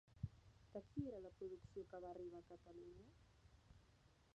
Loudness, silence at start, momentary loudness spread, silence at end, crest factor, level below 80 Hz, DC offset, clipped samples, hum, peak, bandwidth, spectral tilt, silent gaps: -55 LUFS; 0.05 s; 11 LU; 0 s; 24 dB; -70 dBFS; under 0.1%; under 0.1%; none; -32 dBFS; 8.4 kHz; -8.5 dB/octave; none